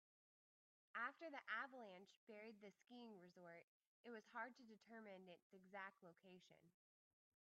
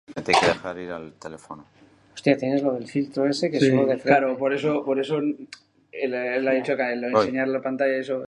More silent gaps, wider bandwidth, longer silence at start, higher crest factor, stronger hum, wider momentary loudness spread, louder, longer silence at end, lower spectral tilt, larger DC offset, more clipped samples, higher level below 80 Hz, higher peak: first, 2.16-2.27 s, 3.63-3.80 s, 3.87-4.04 s, 5.42-5.50 s vs none; second, 7.2 kHz vs 11 kHz; first, 0.95 s vs 0.1 s; about the same, 24 dB vs 20 dB; neither; about the same, 17 LU vs 19 LU; second, -57 LUFS vs -23 LUFS; first, 0.75 s vs 0 s; second, -2 dB/octave vs -5.5 dB/octave; neither; neither; second, under -90 dBFS vs -62 dBFS; second, -36 dBFS vs -4 dBFS